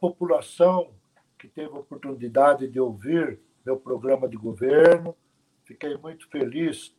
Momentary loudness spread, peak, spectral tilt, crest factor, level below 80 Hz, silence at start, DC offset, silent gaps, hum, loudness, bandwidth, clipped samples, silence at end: 20 LU; -4 dBFS; -6.5 dB/octave; 20 dB; -72 dBFS; 0 s; under 0.1%; none; none; -23 LUFS; 11.5 kHz; under 0.1%; 0.1 s